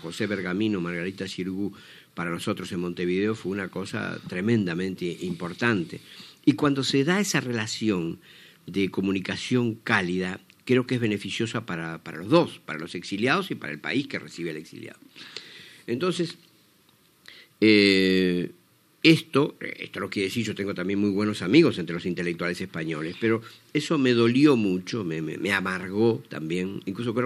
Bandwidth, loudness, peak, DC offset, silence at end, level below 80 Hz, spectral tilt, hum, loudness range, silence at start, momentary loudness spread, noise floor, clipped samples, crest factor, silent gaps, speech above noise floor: 14 kHz; -26 LUFS; -2 dBFS; under 0.1%; 0 s; -68 dBFS; -5.5 dB/octave; none; 7 LU; 0 s; 15 LU; -61 dBFS; under 0.1%; 24 dB; none; 35 dB